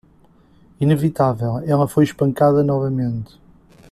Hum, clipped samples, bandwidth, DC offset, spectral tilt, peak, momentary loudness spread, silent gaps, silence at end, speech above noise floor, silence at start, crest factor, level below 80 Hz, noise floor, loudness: none; under 0.1%; 14.5 kHz; under 0.1%; -8.5 dB/octave; -2 dBFS; 8 LU; none; 0.65 s; 35 dB; 0.8 s; 16 dB; -50 dBFS; -52 dBFS; -18 LUFS